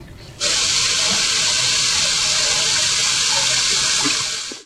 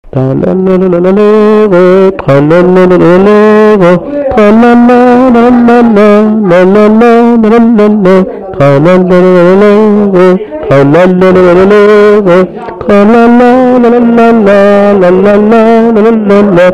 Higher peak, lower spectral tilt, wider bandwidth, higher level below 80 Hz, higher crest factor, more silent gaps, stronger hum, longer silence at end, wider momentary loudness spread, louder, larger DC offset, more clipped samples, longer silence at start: about the same, -2 dBFS vs 0 dBFS; second, 0.5 dB/octave vs -8.5 dB/octave; first, 16 kHz vs 9.2 kHz; second, -48 dBFS vs -34 dBFS; first, 16 dB vs 4 dB; neither; neither; about the same, 0.05 s vs 0 s; about the same, 3 LU vs 4 LU; second, -15 LUFS vs -4 LUFS; second, under 0.1% vs 3%; second, under 0.1% vs 1%; second, 0 s vs 0.15 s